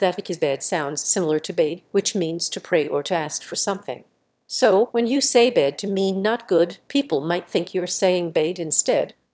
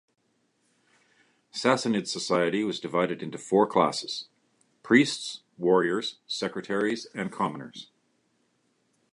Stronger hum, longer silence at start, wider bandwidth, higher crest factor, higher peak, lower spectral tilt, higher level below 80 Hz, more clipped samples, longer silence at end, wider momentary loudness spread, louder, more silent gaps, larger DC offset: neither; second, 0 s vs 1.55 s; second, 8 kHz vs 11.5 kHz; about the same, 18 dB vs 22 dB; about the same, -4 dBFS vs -6 dBFS; about the same, -3.5 dB/octave vs -4.5 dB/octave; about the same, -72 dBFS vs -72 dBFS; neither; second, 0.25 s vs 1.3 s; second, 7 LU vs 14 LU; first, -22 LUFS vs -27 LUFS; neither; neither